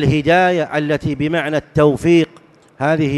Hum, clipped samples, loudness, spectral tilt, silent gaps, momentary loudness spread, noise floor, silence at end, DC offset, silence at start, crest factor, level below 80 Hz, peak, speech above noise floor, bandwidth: none; under 0.1%; -16 LUFS; -7 dB/octave; none; 6 LU; -46 dBFS; 0 s; under 0.1%; 0 s; 14 dB; -42 dBFS; -2 dBFS; 32 dB; 12 kHz